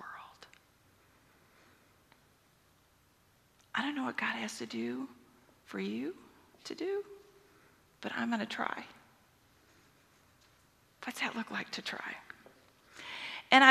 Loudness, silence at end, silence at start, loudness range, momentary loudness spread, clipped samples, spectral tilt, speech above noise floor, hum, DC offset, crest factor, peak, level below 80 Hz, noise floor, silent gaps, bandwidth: -36 LUFS; 0 s; 0 s; 4 LU; 19 LU; under 0.1%; -3 dB/octave; 30 dB; none; under 0.1%; 32 dB; -4 dBFS; -80 dBFS; -68 dBFS; none; 14 kHz